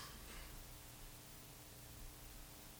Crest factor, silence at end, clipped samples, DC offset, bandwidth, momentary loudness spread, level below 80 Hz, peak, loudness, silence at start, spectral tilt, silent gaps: 14 dB; 0 s; under 0.1%; under 0.1%; over 20 kHz; 2 LU; -60 dBFS; -40 dBFS; -55 LUFS; 0 s; -3 dB/octave; none